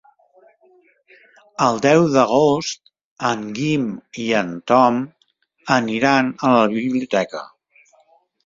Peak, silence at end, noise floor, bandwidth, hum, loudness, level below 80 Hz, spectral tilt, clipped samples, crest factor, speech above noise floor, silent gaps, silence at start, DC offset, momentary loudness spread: -2 dBFS; 1 s; -62 dBFS; 7.6 kHz; none; -18 LUFS; -60 dBFS; -5.5 dB/octave; under 0.1%; 18 dB; 44 dB; 3.04-3.16 s; 1.6 s; under 0.1%; 13 LU